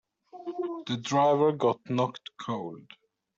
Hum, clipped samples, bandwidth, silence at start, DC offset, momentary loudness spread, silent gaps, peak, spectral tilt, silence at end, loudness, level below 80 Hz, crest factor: none; under 0.1%; 7.8 kHz; 0.35 s; under 0.1%; 17 LU; none; -12 dBFS; -6 dB/octave; 0.55 s; -28 LUFS; -72 dBFS; 16 dB